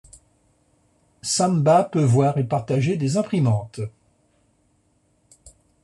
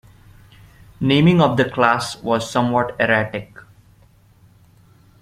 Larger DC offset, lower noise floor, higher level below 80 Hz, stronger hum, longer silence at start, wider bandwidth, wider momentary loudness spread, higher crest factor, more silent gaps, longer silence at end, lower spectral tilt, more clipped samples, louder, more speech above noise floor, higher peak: neither; first, -64 dBFS vs -52 dBFS; second, -60 dBFS vs -50 dBFS; neither; first, 1.25 s vs 1 s; second, 12 kHz vs 14 kHz; first, 15 LU vs 9 LU; about the same, 18 dB vs 20 dB; neither; first, 1.95 s vs 1.8 s; about the same, -6 dB/octave vs -6 dB/octave; neither; second, -21 LUFS vs -18 LUFS; first, 45 dB vs 35 dB; second, -6 dBFS vs 0 dBFS